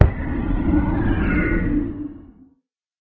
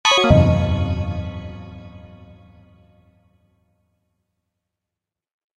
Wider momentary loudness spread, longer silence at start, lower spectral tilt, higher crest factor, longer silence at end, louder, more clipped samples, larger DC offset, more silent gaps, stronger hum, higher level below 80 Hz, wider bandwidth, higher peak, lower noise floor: second, 9 LU vs 26 LU; about the same, 0 s vs 0.05 s; first, -10.5 dB/octave vs -5 dB/octave; about the same, 20 dB vs 22 dB; second, 0.8 s vs 3.55 s; second, -22 LUFS vs -18 LUFS; neither; neither; neither; neither; first, -26 dBFS vs -34 dBFS; second, 4.3 kHz vs 10.5 kHz; about the same, 0 dBFS vs 0 dBFS; second, -65 dBFS vs -86 dBFS